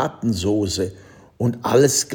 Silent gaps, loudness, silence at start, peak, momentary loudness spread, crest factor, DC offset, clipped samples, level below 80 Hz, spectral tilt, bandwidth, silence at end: none; -20 LUFS; 0 s; -4 dBFS; 9 LU; 18 dB; under 0.1%; under 0.1%; -52 dBFS; -4.5 dB/octave; 18 kHz; 0 s